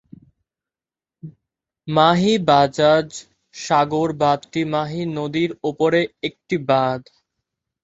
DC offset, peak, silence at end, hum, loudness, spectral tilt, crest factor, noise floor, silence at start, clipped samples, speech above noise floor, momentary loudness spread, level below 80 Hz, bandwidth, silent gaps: under 0.1%; -2 dBFS; 0.85 s; none; -19 LUFS; -5.5 dB/octave; 20 dB; under -90 dBFS; 1.25 s; under 0.1%; over 71 dB; 13 LU; -58 dBFS; 8.2 kHz; none